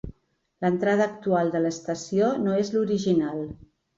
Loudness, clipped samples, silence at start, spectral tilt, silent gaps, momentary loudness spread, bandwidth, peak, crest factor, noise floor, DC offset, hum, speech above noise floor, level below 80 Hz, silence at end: -25 LUFS; under 0.1%; 0.05 s; -6.5 dB/octave; none; 9 LU; 7.8 kHz; -10 dBFS; 16 dB; -61 dBFS; under 0.1%; none; 37 dB; -54 dBFS; 0.4 s